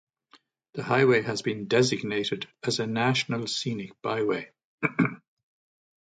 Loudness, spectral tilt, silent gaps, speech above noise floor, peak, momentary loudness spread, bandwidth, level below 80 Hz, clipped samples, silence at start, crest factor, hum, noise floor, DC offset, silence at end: -27 LUFS; -5 dB/octave; 4.64-4.78 s; 35 dB; -8 dBFS; 10 LU; 9.4 kHz; -68 dBFS; under 0.1%; 0.75 s; 20 dB; none; -62 dBFS; under 0.1%; 0.85 s